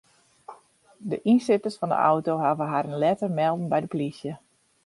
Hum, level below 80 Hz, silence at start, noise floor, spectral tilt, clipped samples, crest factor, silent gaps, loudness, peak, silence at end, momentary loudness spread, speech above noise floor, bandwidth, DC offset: none; -70 dBFS; 0.5 s; -55 dBFS; -7.5 dB/octave; under 0.1%; 18 dB; none; -25 LUFS; -8 dBFS; 0.5 s; 13 LU; 31 dB; 11.5 kHz; under 0.1%